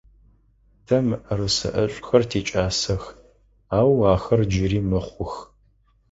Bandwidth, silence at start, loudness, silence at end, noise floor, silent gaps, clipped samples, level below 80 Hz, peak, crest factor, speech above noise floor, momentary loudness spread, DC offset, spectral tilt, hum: 8 kHz; 0.9 s; -22 LUFS; 0.65 s; -60 dBFS; none; under 0.1%; -40 dBFS; -2 dBFS; 20 dB; 39 dB; 12 LU; under 0.1%; -5.5 dB/octave; none